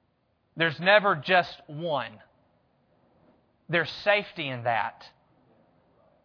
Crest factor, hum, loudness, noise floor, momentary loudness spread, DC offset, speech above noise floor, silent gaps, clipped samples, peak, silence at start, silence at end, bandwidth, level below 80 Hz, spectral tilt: 24 dB; none; -26 LUFS; -71 dBFS; 15 LU; under 0.1%; 45 dB; none; under 0.1%; -4 dBFS; 0.55 s; 1.15 s; 5.4 kHz; -72 dBFS; -6 dB/octave